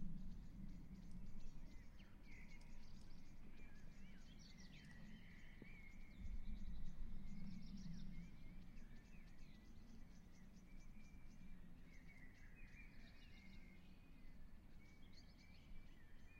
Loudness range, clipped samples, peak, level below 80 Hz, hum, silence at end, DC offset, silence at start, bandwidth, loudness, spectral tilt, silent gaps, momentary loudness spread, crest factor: 7 LU; under 0.1%; -36 dBFS; -56 dBFS; none; 0 s; under 0.1%; 0 s; 7.2 kHz; -62 LUFS; -6 dB/octave; none; 9 LU; 16 dB